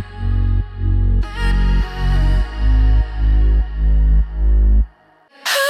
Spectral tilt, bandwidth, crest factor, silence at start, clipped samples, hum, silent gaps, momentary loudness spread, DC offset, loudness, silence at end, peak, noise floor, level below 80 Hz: -5.5 dB/octave; 14 kHz; 10 dB; 0 s; under 0.1%; none; none; 5 LU; under 0.1%; -18 LUFS; 0 s; -6 dBFS; -50 dBFS; -16 dBFS